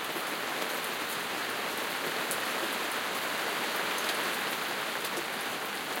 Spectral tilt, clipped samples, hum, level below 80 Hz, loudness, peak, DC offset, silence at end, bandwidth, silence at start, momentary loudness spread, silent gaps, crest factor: -1 dB/octave; under 0.1%; none; -78 dBFS; -32 LUFS; -10 dBFS; under 0.1%; 0 s; 17 kHz; 0 s; 3 LU; none; 22 dB